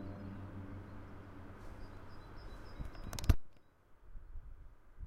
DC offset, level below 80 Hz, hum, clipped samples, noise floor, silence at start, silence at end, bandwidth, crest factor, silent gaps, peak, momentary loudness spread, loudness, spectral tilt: under 0.1%; -44 dBFS; none; under 0.1%; -63 dBFS; 0 s; 0 s; 16 kHz; 28 dB; none; -14 dBFS; 23 LU; -45 LUFS; -6 dB/octave